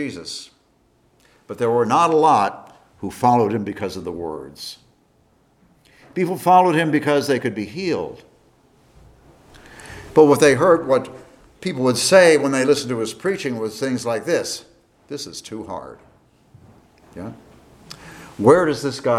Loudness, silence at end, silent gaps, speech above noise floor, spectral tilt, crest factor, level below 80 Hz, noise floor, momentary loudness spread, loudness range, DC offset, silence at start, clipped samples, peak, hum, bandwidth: -18 LUFS; 0 s; none; 41 dB; -4.5 dB/octave; 20 dB; -56 dBFS; -60 dBFS; 21 LU; 11 LU; under 0.1%; 0 s; under 0.1%; 0 dBFS; none; 15.5 kHz